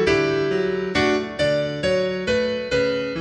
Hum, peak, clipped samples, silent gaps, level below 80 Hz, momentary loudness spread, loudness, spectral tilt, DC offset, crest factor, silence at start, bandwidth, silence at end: none; -6 dBFS; under 0.1%; none; -44 dBFS; 2 LU; -21 LUFS; -5 dB/octave; under 0.1%; 14 dB; 0 s; 10 kHz; 0 s